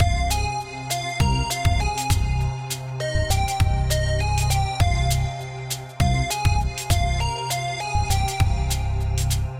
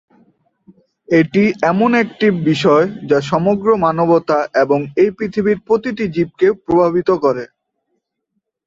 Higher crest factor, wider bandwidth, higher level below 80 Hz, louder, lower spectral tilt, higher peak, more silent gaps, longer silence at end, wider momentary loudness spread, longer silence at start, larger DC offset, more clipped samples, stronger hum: about the same, 14 dB vs 14 dB; first, 17 kHz vs 7.8 kHz; first, -26 dBFS vs -52 dBFS; second, -23 LUFS vs -15 LUFS; second, -4.5 dB/octave vs -7 dB/octave; second, -6 dBFS vs -2 dBFS; neither; second, 0 s vs 1.2 s; about the same, 6 LU vs 5 LU; second, 0 s vs 1.1 s; neither; neither; neither